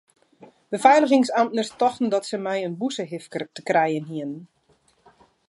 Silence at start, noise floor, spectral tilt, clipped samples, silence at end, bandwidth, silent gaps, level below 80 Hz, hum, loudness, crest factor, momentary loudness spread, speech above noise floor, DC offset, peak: 0.4 s; -63 dBFS; -5 dB/octave; under 0.1%; 1.05 s; 11.5 kHz; none; -74 dBFS; none; -22 LUFS; 22 dB; 15 LU; 41 dB; under 0.1%; -2 dBFS